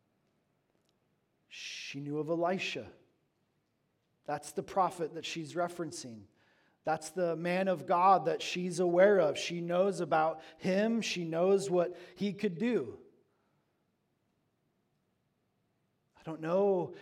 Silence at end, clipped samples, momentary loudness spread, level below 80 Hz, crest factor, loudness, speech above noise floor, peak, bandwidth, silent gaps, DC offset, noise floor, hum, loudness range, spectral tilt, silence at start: 0 s; under 0.1%; 15 LU; -80 dBFS; 20 dB; -32 LUFS; 47 dB; -14 dBFS; 14.5 kHz; none; under 0.1%; -78 dBFS; none; 10 LU; -5 dB/octave; 1.5 s